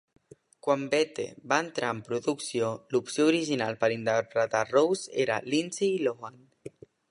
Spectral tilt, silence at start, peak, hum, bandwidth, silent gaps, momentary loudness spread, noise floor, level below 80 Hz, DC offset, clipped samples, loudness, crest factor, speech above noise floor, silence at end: -4.5 dB/octave; 0.65 s; -8 dBFS; none; 11.5 kHz; none; 12 LU; -55 dBFS; -74 dBFS; under 0.1%; under 0.1%; -28 LUFS; 20 dB; 27 dB; 0.45 s